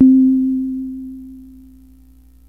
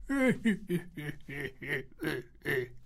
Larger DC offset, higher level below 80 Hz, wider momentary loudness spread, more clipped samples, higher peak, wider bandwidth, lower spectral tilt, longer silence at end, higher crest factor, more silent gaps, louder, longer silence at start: first, 0.2% vs under 0.1%; first, -48 dBFS vs -54 dBFS; first, 25 LU vs 12 LU; neither; first, -2 dBFS vs -16 dBFS; second, 0.8 kHz vs 16 kHz; first, -10 dB/octave vs -6 dB/octave; first, 1.05 s vs 0 s; about the same, 16 dB vs 18 dB; neither; first, -16 LUFS vs -34 LUFS; about the same, 0 s vs 0 s